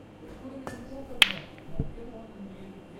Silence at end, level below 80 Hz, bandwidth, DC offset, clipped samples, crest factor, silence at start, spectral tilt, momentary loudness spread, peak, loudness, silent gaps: 0 s; -46 dBFS; 16.5 kHz; under 0.1%; under 0.1%; 32 dB; 0 s; -2.5 dB/octave; 22 LU; 0 dBFS; -26 LUFS; none